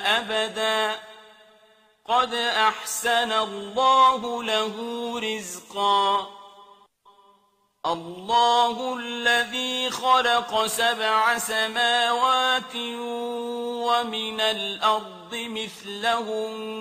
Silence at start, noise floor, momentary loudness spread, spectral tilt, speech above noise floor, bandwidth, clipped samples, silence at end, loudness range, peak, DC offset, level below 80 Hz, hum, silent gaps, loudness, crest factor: 0 s; -65 dBFS; 11 LU; -1.5 dB/octave; 41 dB; 15.5 kHz; under 0.1%; 0 s; 5 LU; -6 dBFS; under 0.1%; -68 dBFS; none; none; -23 LUFS; 18 dB